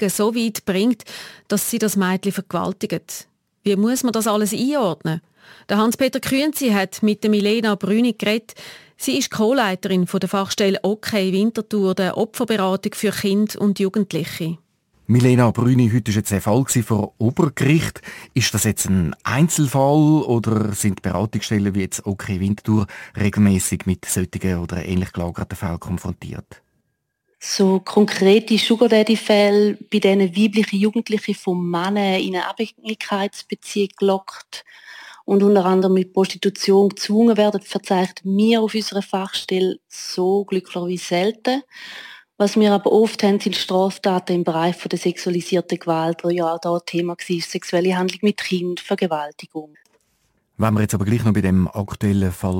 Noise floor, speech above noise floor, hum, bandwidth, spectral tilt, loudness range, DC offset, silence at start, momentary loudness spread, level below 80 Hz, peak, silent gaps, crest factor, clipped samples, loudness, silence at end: -72 dBFS; 53 dB; none; 17 kHz; -5.5 dB/octave; 5 LU; under 0.1%; 0 s; 11 LU; -50 dBFS; -2 dBFS; none; 16 dB; under 0.1%; -19 LUFS; 0 s